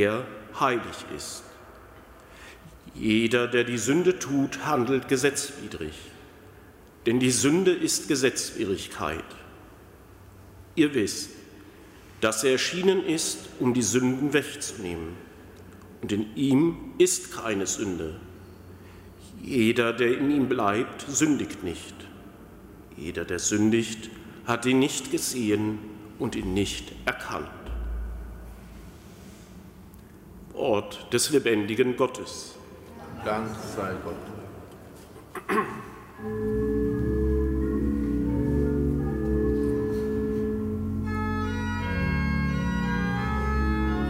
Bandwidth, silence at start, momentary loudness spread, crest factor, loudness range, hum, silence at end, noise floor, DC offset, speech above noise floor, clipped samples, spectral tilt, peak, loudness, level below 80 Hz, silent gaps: 16 kHz; 0 s; 23 LU; 18 dB; 7 LU; none; 0 s; -50 dBFS; under 0.1%; 24 dB; under 0.1%; -4.5 dB/octave; -8 dBFS; -26 LUFS; -40 dBFS; none